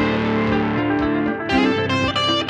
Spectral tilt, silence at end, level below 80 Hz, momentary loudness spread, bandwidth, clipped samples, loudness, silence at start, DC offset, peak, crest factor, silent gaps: -5.5 dB/octave; 0 s; -40 dBFS; 2 LU; 9.6 kHz; under 0.1%; -19 LUFS; 0 s; under 0.1%; -6 dBFS; 14 dB; none